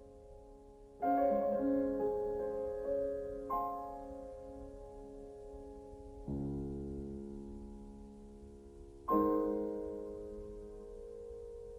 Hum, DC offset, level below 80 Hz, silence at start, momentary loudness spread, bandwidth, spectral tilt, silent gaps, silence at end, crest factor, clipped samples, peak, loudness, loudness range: none; under 0.1%; -56 dBFS; 0 s; 21 LU; 15.5 kHz; -9.5 dB/octave; none; 0 s; 20 dB; under 0.1%; -20 dBFS; -38 LUFS; 10 LU